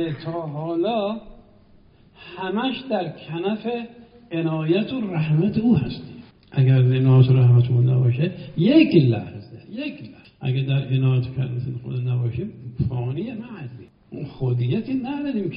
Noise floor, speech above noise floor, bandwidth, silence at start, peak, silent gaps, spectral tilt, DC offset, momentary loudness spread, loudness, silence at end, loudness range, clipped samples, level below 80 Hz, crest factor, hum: -52 dBFS; 32 dB; 5.2 kHz; 0 s; -2 dBFS; none; -7.5 dB/octave; under 0.1%; 18 LU; -22 LUFS; 0 s; 10 LU; under 0.1%; -52 dBFS; 18 dB; none